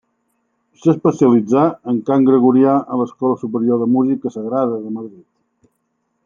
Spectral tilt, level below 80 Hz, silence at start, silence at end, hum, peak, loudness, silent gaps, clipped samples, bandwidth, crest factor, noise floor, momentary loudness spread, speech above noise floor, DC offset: -9 dB/octave; -62 dBFS; 0.85 s; 1.15 s; none; 0 dBFS; -16 LUFS; none; under 0.1%; 7.2 kHz; 16 dB; -69 dBFS; 10 LU; 54 dB; under 0.1%